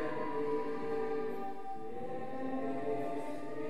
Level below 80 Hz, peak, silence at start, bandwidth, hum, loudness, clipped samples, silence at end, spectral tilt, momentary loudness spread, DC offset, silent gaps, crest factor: -70 dBFS; -24 dBFS; 0 s; 13.5 kHz; none; -39 LUFS; under 0.1%; 0 s; -7 dB/octave; 7 LU; 1%; none; 12 dB